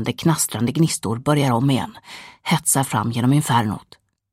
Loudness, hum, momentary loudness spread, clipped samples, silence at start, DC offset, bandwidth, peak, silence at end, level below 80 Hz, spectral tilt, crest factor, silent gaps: -19 LUFS; none; 13 LU; under 0.1%; 0 s; under 0.1%; 16 kHz; -4 dBFS; 0.5 s; -56 dBFS; -5 dB/octave; 18 dB; none